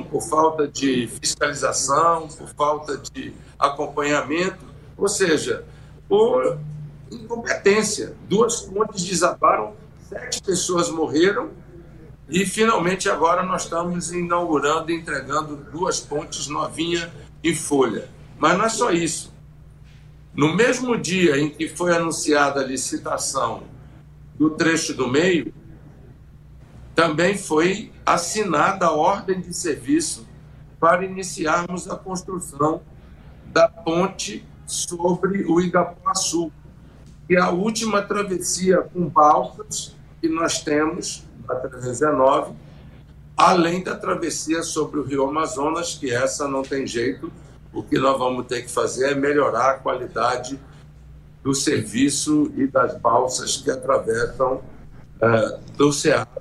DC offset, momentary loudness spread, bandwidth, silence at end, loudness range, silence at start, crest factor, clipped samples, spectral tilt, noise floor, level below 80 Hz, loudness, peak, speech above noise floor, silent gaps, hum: under 0.1%; 11 LU; 13.5 kHz; 0 s; 3 LU; 0 s; 22 dB; under 0.1%; -4 dB/octave; -45 dBFS; -48 dBFS; -21 LUFS; 0 dBFS; 24 dB; none; none